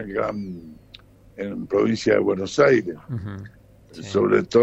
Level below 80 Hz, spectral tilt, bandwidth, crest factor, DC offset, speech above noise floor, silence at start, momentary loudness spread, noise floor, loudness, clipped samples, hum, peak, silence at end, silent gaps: -54 dBFS; -6 dB/octave; 8.2 kHz; 20 dB; under 0.1%; 27 dB; 0 s; 18 LU; -49 dBFS; -22 LUFS; under 0.1%; none; -2 dBFS; 0 s; none